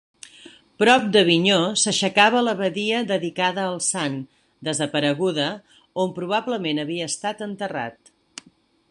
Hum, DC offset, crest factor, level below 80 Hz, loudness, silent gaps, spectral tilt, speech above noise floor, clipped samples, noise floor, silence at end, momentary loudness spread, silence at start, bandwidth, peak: none; under 0.1%; 20 dB; -68 dBFS; -21 LUFS; none; -3.5 dB/octave; 36 dB; under 0.1%; -58 dBFS; 1 s; 17 LU; 0.45 s; 11.5 kHz; -2 dBFS